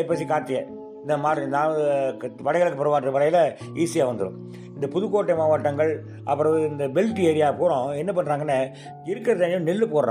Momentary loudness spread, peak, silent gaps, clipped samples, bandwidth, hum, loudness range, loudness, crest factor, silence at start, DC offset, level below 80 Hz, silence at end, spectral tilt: 10 LU; -10 dBFS; none; under 0.1%; 14 kHz; none; 1 LU; -23 LUFS; 14 dB; 0 s; under 0.1%; -68 dBFS; 0 s; -6.5 dB/octave